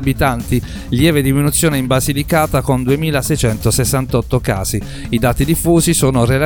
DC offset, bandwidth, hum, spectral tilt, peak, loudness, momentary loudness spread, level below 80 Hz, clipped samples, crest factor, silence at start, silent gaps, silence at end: under 0.1%; 19 kHz; none; -5 dB/octave; 0 dBFS; -15 LUFS; 6 LU; -28 dBFS; under 0.1%; 14 dB; 0 s; none; 0 s